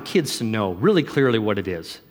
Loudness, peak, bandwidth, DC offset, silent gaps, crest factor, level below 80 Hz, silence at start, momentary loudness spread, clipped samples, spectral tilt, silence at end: -21 LUFS; -6 dBFS; 18 kHz; under 0.1%; none; 16 dB; -58 dBFS; 0 s; 8 LU; under 0.1%; -5.5 dB/octave; 0.1 s